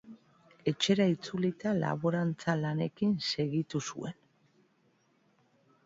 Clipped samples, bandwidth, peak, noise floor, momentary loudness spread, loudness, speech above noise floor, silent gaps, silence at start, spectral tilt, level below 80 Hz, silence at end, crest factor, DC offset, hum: under 0.1%; 7.8 kHz; -14 dBFS; -70 dBFS; 8 LU; -32 LUFS; 40 dB; none; 0.05 s; -5.5 dB/octave; -70 dBFS; 1.75 s; 18 dB; under 0.1%; none